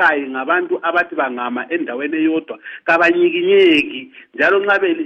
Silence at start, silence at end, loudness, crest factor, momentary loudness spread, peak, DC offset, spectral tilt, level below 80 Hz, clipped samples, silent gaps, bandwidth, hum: 0 s; 0 s; -16 LUFS; 14 dB; 11 LU; -2 dBFS; under 0.1%; -5 dB/octave; -62 dBFS; under 0.1%; none; 8.4 kHz; none